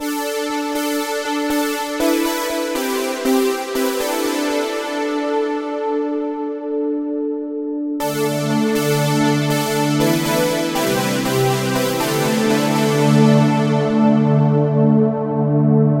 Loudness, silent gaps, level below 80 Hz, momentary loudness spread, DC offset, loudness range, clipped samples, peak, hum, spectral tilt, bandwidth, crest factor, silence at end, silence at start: -18 LUFS; none; -54 dBFS; 7 LU; under 0.1%; 6 LU; under 0.1%; -2 dBFS; none; -5.5 dB/octave; 16 kHz; 14 dB; 0 s; 0 s